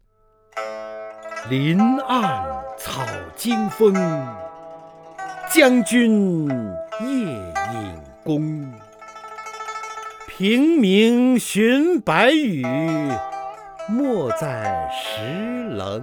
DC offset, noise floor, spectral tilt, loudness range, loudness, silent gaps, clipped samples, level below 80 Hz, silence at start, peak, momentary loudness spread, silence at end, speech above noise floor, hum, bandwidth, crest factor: under 0.1%; -58 dBFS; -5.5 dB/octave; 8 LU; -20 LUFS; none; under 0.1%; -54 dBFS; 0.55 s; 0 dBFS; 19 LU; 0 s; 39 dB; none; over 20 kHz; 20 dB